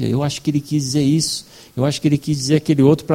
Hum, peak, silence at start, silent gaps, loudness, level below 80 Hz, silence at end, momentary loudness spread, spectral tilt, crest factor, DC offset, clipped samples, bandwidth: none; 0 dBFS; 0 s; none; -18 LUFS; -50 dBFS; 0 s; 7 LU; -6 dB/octave; 16 dB; under 0.1%; under 0.1%; 16 kHz